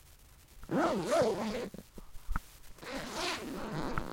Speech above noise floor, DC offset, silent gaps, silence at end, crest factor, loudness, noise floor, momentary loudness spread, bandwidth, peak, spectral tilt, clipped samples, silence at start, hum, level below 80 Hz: 26 dB; under 0.1%; none; 0 s; 20 dB; -35 LUFS; -58 dBFS; 23 LU; 16.5 kHz; -16 dBFS; -4.5 dB/octave; under 0.1%; 0.05 s; none; -48 dBFS